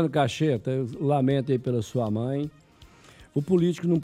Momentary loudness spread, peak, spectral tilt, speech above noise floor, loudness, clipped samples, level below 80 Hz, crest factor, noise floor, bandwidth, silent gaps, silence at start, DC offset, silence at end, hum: 8 LU; -10 dBFS; -7.5 dB/octave; 28 dB; -26 LUFS; under 0.1%; -58 dBFS; 16 dB; -52 dBFS; 13.5 kHz; none; 0 s; under 0.1%; 0 s; none